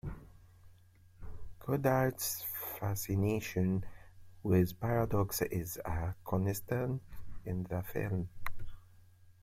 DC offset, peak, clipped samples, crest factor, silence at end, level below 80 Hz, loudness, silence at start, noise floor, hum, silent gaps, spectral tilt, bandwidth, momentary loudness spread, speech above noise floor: under 0.1%; -16 dBFS; under 0.1%; 20 dB; 0.1 s; -52 dBFS; -35 LUFS; 0.05 s; -61 dBFS; none; none; -6 dB/octave; 16.5 kHz; 22 LU; 27 dB